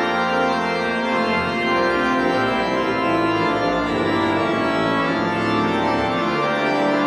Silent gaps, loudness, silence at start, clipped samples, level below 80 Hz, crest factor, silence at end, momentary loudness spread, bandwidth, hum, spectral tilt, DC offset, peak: none; -19 LUFS; 0 s; under 0.1%; -48 dBFS; 14 dB; 0 s; 2 LU; 12.5 kHz; none; -5.5 dB/octave; under 0.1%; -6 dBFS